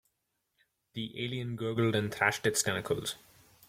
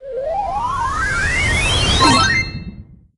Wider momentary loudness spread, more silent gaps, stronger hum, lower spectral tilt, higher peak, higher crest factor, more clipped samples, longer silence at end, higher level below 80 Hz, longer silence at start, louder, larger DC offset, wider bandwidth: about the same, 12 LU vs 12 LU; neither; neither; about the same, -4 dB/octave vs -3 dB/octave; second, -12 dBFS vs 0 dBFS; about the same, 22 dB vs 18 dB; neither; first, 0.5 s vs 0.25 s; second, -66 dBFS vs -28 dBFS; first, 0.95 s vs 0 s; second, -32 LUFS vs -16 LUFS; neither; first, 16.5 kHz vs 11.5 kHz